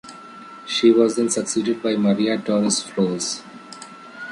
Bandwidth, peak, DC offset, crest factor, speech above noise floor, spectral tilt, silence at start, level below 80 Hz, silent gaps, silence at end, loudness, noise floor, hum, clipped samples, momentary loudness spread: 11.5 kHz; -4 dBFS; under 0.1%; 18 dB; 21 dB; -4 dB/octave; 0.05 s; -66 dBFS; none; 0 s; -20 LUFS; -40 dBFS; none; under 0.1%; 22 LU